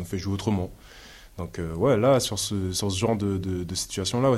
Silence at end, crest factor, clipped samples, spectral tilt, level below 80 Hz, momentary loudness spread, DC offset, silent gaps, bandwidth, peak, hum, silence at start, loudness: 0 s; 18 dB; under 0.1%; -5 dB/octave; -50 dBFS; 15 LU; under 0.1%; none; 16 kHz; -8 dBFS; none; 0 s; -26 LUFS